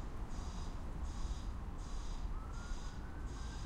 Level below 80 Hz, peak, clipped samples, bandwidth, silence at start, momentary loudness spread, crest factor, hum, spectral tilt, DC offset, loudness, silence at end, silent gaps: -44 dBFS; -28 dBFS; under 0.1%; 11 kHz; 0 s; 3 LU; 14 dB; none; -5.5 dB/octave; under 0.1%; -47 LUFS; 0 s; none